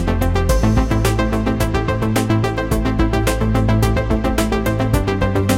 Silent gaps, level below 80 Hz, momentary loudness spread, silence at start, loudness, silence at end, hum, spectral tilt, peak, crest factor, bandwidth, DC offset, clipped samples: none; -22 dBFS; 3 LU; 0 s; -18 LUFS; 0 s; none; -6 dB/octave; -4 dBFS; 12 dB; 16.5 kHz; under 0.1%; under 0.1%